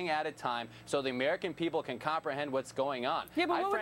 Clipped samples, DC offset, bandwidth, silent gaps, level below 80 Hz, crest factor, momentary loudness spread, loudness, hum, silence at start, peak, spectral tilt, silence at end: under 0.1%; under 0.1%; 16.5 kHz; none; -70 dBFS; 18 dB; 4 LU; -34 LUFS; none; 0 s; -16 dBFS; -4.5 dB/octave; 0 s